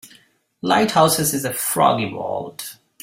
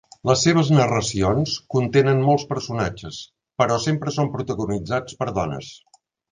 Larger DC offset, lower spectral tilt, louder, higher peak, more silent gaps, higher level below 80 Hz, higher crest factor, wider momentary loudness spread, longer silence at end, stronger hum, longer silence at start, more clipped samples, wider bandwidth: neither; second, -3.5 dB/octave vs -5.5 dB/octave; about the same, -19 LUFS vs -21 LUFS; about the same, -2 dBFS vs -2 dBFS; neither; second, -58 dBFS vs -46 dBFS; about the same, 18 dB vs 20 dB; about the same, 15 LU vs 14 LU; second, 0.3 s vs 0.55 s; neither; second, 0.05 s vs 0.25 s; neither; first, 16.5 kHz vs 9.8 kHz